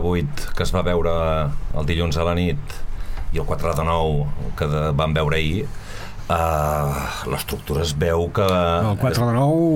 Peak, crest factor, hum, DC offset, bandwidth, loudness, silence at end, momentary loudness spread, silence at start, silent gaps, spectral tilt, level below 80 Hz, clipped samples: -6 dBFS; 14 dB; none; under 0.1%; 17 kHz; -22 LUFS; 0 s; 10 LU; 0 s; none; -6 dB/octave; -28 dBFS; under 0.1%